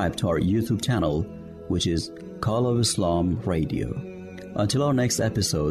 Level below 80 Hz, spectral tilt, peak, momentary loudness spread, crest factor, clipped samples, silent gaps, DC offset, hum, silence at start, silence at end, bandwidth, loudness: -46 dBFS; -5.5 dB/octave; -12 dBFS; 12 LU; 12 dB; under 0.1%; none; under 0.1%; none; 0 s; 0 s; 13.5 kHz; -25 LUFS